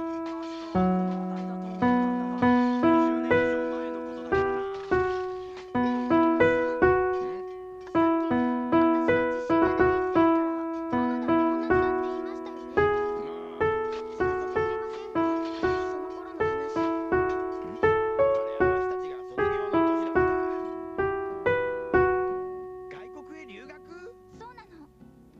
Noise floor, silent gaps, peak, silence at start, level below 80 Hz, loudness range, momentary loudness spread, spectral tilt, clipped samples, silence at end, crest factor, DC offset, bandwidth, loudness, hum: -53 dBFS; none; -8 dBFS; 0 s; -50 dBFS; 5 LU; 14 LU; -8 dB/octave; under 0.1%; 0.35 s; 18 dB; under 0.1%; 7.2 kHz; -26 LUFS; none